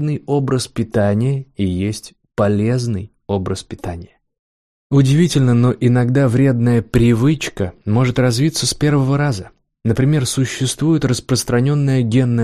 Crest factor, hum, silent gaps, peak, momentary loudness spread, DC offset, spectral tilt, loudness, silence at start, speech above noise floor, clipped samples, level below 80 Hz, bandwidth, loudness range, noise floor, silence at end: 14 dB; none; 4.39-4.90 s; -2 dBFS; 10 LU; under 0.1%; -6 dB/octave; -16 LUFS; 0 s; over 75 dB; under 0.1%; -40 dBFS; 14 kHz; 6 LU; under -90 dBFS; 0 s